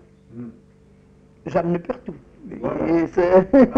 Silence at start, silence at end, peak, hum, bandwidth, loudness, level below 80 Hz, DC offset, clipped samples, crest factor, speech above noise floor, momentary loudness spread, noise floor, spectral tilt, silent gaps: 0.35 s; 0 s; -4 dBFS; none; 7 kHz; -20 LUFS; -46 dBFS; under 0.1%; under 0.1%; 18 dB; 32 dB; 23 LU; -51 dBFS; -9 dB/octave; none